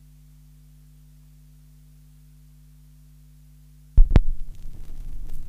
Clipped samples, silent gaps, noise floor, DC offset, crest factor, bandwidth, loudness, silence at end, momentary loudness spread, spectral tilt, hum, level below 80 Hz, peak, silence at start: under 0.1%; none; -50 dBFS; under 0.1%; 22 dB; 4.1 kHz; -25 LUFS; 0 s; 23 LU; -8 dB/octave; 50 Hz at -50 dBFS; -24 dBFS; -2 dBFS; 3.95 s